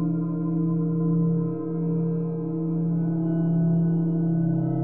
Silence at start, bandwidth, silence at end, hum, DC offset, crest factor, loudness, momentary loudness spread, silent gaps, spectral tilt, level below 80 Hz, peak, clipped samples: 0 s; 1.7 kHz; 0 s; none; 0.5%; 10 dB; -25 LUFS; 5 LU; none; -15 dB/octave; -60 dBFS; -14 dBFS; under 0.1%